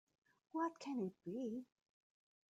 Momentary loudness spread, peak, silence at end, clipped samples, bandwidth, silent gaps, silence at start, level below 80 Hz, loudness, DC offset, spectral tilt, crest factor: 8 LU; -30 dBFS; 0.9 s; under 0.1%; 9.2 kHz; none; 0.55 s; under -90 dBFS; -46 LUFS; under 0.1%; -6.5 dB/octave; 18 dB